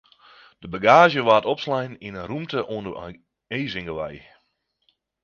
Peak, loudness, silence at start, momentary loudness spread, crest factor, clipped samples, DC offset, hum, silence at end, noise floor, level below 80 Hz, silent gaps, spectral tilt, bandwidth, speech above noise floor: -2 dBFS; -21 LUFS; 0.6 s; 20 LU; 22 dB; under 0.1%; under 0.1%; none; 1.05 s; -72 dBFS; -56 dBFS; none; -5.5 dB/octave; 7 kHz; 50 dB